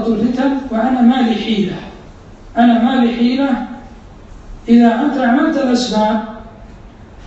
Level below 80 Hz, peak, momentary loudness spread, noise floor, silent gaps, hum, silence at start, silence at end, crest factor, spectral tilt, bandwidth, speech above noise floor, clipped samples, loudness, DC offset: -40 dBFS; 0 dBFS; 18 LU; -37 dBFS; none; none; 0 s; 0 s; 14 dB; -6 dB/octave; 8 kHz; 24 dB; under 0.1%; -14 LUFS; under 0.1%